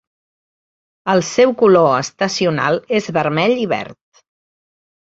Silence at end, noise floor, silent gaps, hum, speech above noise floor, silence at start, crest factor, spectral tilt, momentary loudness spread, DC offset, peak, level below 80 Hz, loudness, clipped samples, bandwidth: 1.2 s; under -90 dBFS; none; none; over 75 dB; 1.05 s; 16 dB; -5 dB/octave; 10 LU; under 0.1%; -2 dBFS; -58 dBFS; -15 LUFS; under 0.1%; 8 kHz